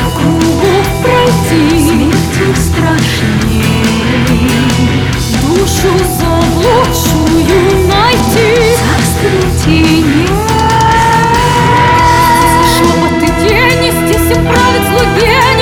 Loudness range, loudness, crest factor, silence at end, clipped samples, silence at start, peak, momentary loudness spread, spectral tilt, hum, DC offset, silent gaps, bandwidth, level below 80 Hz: 3 LU; -8 LUFS; 8 dB; 0 s; under 0.1%; 0 s; 0 dBFS; 4 LU; -5 dB/octave; none; under 0.1%; none; 19 kHz; -20 dBFS